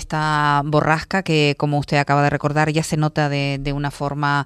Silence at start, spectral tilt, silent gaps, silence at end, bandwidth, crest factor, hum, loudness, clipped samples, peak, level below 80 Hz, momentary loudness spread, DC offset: 0 s; -6 dB/octave; none; 0 s; 13 kHz; 16 dB; none; -19 LUFS; under 0.1%; -2 dBFS; -42 dBFS; 5 LU; under 0.1%